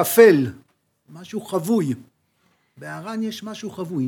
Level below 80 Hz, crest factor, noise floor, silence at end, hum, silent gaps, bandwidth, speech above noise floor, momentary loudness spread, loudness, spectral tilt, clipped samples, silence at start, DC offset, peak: -74 dBFS; 20 dB; -65 dBFS; 0 s; none; none; 20 kHz; 45 dB; 20 LU; -21 LUFS; -5.5 dB/octave; under 0.1%; 0 s; under 0.1%; 0 dBFS